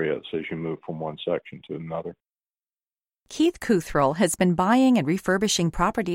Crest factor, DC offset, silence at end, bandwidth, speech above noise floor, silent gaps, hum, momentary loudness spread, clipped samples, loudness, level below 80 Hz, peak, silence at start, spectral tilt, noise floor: 18 dB; under 0.1%; 0 s; 16.5 kHz; over 66 dB; none; none; 14 LU; under 0.1%; -24 LUFS; -48 dBFS; -6 dBFS; 0 s; -5 dB/octave; under -90 dBFS